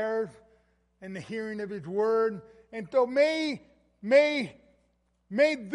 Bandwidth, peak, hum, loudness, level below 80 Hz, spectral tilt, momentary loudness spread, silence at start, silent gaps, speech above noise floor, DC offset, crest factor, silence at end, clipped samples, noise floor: 11 kHz; -8 dBFS; none; -27 LUFS; -70 dBFS; -5 dB/octave; 19 LU; 0 s; none; 44 dB; under 0.1%; 20 dB; 0 s; under 0.1%; -71 dBFS